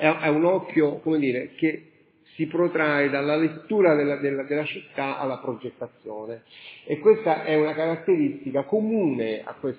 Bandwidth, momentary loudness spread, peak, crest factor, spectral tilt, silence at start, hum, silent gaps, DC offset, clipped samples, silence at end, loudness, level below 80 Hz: 4 kHz; 16 LU; -4 dBFS; 20 dB; -10.5 dB/octave; 0 s; none; none; under 0.1%; under 0.1%; 0 s; -24 LUFS; -74 dBFS